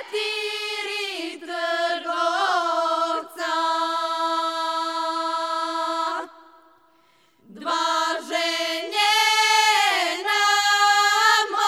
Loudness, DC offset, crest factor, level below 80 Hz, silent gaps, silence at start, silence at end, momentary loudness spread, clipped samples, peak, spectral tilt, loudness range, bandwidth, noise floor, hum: -21 LUFS; under 0.1%; 18 dB; -86 dBFS; none; 0 s; 0 s; 10 LU; under 0.1%; -4 dBFS; 1 dB/octave; 8 LU; 17 kHz; -60 dBFS; none